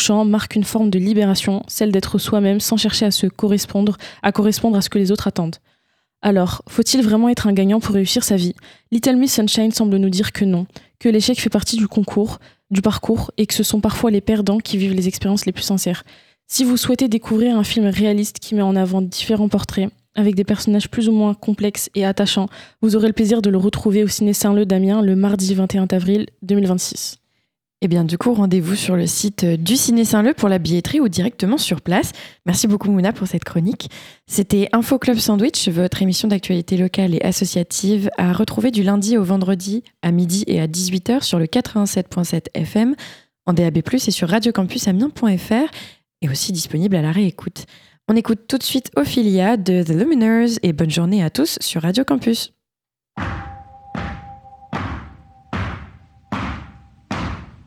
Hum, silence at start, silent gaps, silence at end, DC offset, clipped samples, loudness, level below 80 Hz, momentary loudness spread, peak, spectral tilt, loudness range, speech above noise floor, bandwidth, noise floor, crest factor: none; 0 s; none; 0.15 s; under 0.1%; under 0.1%; -18 LUFS; -44 dBFS; 11 LU; 0 dBFS; -5 dB/octave; 3 LU; 72 dB; 17.5 kHz; -89 dBFS; 18 dB